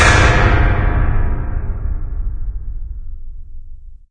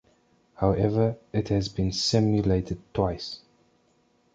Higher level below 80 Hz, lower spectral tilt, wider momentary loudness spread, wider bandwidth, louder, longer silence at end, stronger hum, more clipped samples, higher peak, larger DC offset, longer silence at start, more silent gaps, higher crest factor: first, -18 dBFS vs -44 dBFS; about the same, -5 dB/octave vs -6 dB/octave; first, 23 LU vs 10 LU; first, 10 kHz vs 9 kHz; first, -17 LUFS vs -26 LUFS; second, 0.15 s vs 0.95 s; neither; neither; first, 0 dBFS vs -8 dBFS; neither; second, 0 s vs 0.6 s; neither; about the same, 16 dB vs 18 dB